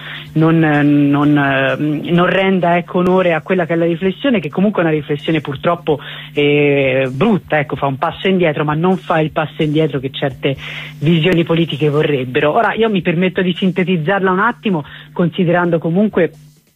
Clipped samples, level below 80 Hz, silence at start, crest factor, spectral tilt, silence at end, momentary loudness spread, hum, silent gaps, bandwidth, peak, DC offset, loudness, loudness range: under 0.1%; -50 dBFS; 0 s; 12 dB; -8 dB/octave; 0.45 s; 7 LU; none; none; 8.4 kHz; -2 dBFS; under 0.1%; -15 LUFS; 3 LU